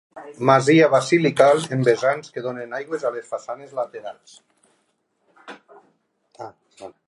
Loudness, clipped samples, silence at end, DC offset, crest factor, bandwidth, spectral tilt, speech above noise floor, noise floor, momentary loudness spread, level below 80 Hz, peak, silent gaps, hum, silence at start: -20 LUFS; under 0.1%; 0.15 s; under 0.1%; 20 dB; 11.5 kHz; -5.5 dB/octave; 49 dB; -69 dBFS; 25 LU; -70 dBFS; -2 dBFS; none; none; 0.15 s